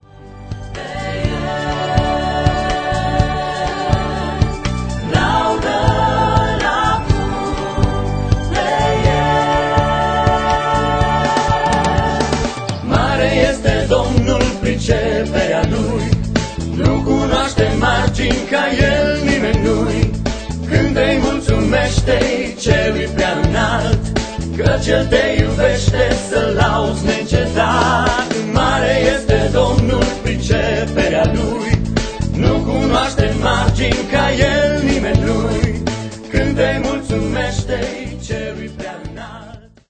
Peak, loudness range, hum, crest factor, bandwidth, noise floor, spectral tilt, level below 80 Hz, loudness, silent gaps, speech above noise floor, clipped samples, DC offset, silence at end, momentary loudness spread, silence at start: 0 dBFS; 3 LU; none; 16 dB; 9.2 kHz; -37 dBFS; -5.5 dB/octave; -24 dBFS; -16 LUFS; none; 23 dB; under 0.1%; under 0.1%; 0.3 s; 7 LU; 0.15 s